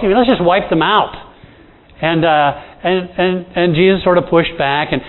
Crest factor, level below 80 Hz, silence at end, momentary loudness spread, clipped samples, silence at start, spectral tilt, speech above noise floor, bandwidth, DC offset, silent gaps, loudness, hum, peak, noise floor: 14 dB; -40 dBFS; 0 s; 6 LU; under 0.1%; 0 s; -9.5 dB/octave; 30 dB; 4.2 kHz; under 0.1%; none; -14 LUFS; none; 0 dBFS; -43 dBFS